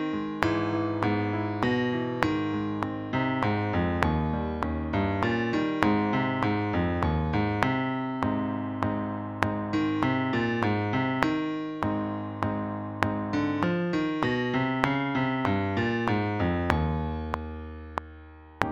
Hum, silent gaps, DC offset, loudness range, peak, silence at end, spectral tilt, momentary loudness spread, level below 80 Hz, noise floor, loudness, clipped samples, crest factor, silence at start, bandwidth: none; none; under 0.1%; 2 LU; 0 dBFS; 0 s; -7.5 dB/octave; 6 LU; -44 dBFS; -47 dBFS; -28 LUFS; under 0.1%; 26 dB; 0 s; 11 kHz